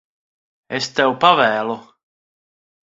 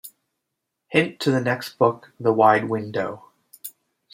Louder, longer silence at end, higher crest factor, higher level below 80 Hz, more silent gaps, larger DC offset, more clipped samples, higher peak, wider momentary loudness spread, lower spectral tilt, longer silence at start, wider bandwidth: first, -17 LUFS vs -22 LUFS; first, 1.05 s vs 0.45 s; about the same, 20 dB vs 20 dB; about the same, -64 dBFS vs -68 dBFS; neither; neither; neither; about the same, 0 dBFS vs -2 dBFS; second, 14 LU vs 21 LU; second, -3.5 dB/octave vs -6 dB/octave; first, 0.7 s vs 0.05 s; second, 7.8 kHz vs 16.5 kHz